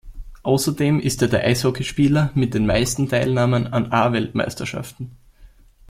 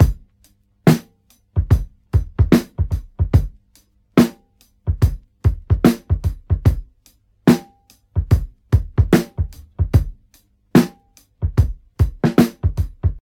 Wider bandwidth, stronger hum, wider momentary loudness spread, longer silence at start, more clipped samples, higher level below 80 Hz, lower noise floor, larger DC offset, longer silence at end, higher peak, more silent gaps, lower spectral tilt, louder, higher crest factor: about the same, 16.5 kHz vs 18 kHz; neither; about the same, 11 LU vs 10 LU; about the same, 0.05 s vs 0 s; neither; second, -40 dBFS vs -26 dBFS; second, -48 dBFS vs -57 dBFS; neither; first, 0.45 s vs 0.05 s; about the same, -2 dBFS vs 0 dBFS; neither; second, -5.5 dB/octave vs -7.5 dB/octave; about the same, -20 LUFS vs -19 LUFS; about the same, 18 dB vs 18 dB